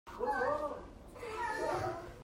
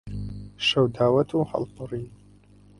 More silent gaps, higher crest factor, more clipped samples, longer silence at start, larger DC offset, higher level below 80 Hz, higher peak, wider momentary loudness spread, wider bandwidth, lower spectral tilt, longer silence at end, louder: neither; about the same, 16 dB vs 18 dB; neither; about the same, 0.05 s vs 0.05 s; neither; second, -58 dBFS vs -48 dBFS; second, -22 dBFS vs -8 dBFS; about the same, 14 LU vs 14 LU; first, 16 kHz vs 11 kHz; about the same, -5 dB/octave vs -6 dB/octave; second, 0 s vs 0.65 s; second, -37 LUFS vs -24 LUFS